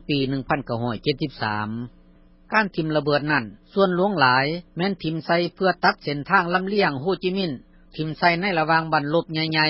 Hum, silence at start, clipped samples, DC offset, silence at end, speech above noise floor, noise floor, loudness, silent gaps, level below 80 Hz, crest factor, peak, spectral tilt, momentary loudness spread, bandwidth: none; 0.1 s; under 0.1%; under 0.1%; 0 s; 30 dB; -52 dBFS; -22 LUFS; none; -52 dBFS; 18 dB; -4 dBFS; -10 dB/octave; 9 LU; 5.8 kHz